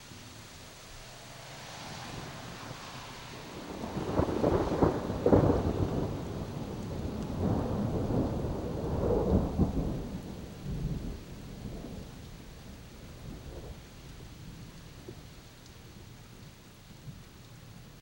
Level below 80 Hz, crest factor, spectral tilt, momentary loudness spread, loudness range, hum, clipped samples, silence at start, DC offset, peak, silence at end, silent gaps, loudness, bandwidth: -44 dBFS; 26 dB; -7 dB/octave; 22 LU; 18 LU; none; under 0.1%; 0 s; under 0.1%; -8 dBFS; 0 s; none; -33 LUFS; 16 kHz